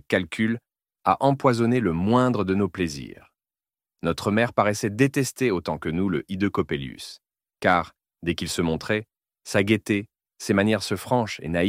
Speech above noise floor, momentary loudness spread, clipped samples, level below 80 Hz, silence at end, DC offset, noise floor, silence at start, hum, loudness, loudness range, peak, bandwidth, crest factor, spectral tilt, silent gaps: over 67 dB; 10 LU; under 0.1%; -52 dBFS; 0 s; under 0.1%; under -90 dBFS; 0.1 s; none; -24 LUFS; 3 LU; -4 dBFS; 16 kHz; 20 dB; -5.5 dB/octave; none